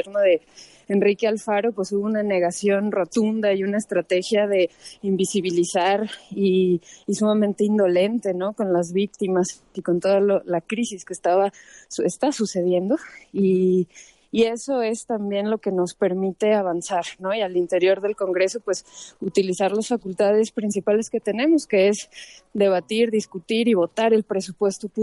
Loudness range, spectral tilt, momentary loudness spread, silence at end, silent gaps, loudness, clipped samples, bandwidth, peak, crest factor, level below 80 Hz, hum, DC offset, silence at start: 2 LU; -5.5 dB/octave; 7 LU; 0 s; none; -22 LUFS; under 0.1%; 11.5 kHz; -8 dBFS; 14 dB; -66 dBFS; none; under 0.1%; 0 s